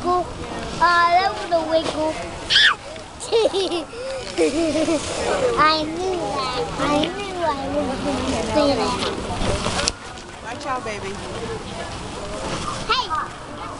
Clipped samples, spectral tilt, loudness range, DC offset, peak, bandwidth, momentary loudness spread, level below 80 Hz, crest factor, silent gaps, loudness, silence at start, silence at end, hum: under 0.1%; -3.5 dB/octave; 8 LU; under 0.1%; 0 dBFS; 11.5 kHz; 14 LU; -40 dBFS; 22 dB; none; -21 LUFS; 0 s; 0 s; none